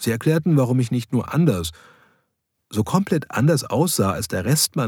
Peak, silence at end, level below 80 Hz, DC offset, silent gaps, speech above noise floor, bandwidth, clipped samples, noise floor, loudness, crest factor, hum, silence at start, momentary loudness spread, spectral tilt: -4 dBFS; 0 s; -52 dBFS; under 0.1%; none; 54 dB; 19 kHz; under 0.1%; -74 dBFS; -20 LUFS; 16 dB; none; 0 s; 6 LU; -5.5 dB/octave